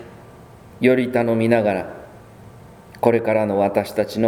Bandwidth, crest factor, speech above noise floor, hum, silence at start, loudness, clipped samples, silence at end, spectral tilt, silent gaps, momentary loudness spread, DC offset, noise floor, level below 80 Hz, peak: 17 kHz; 20 dB; 25 dB; none; 0 s; -19 LUFS; under 0.1%; 0 s; -7 dB/octave; none; 7 LU; under 0.1%; -43 dBFS; -54 dBFS; 0 dBFS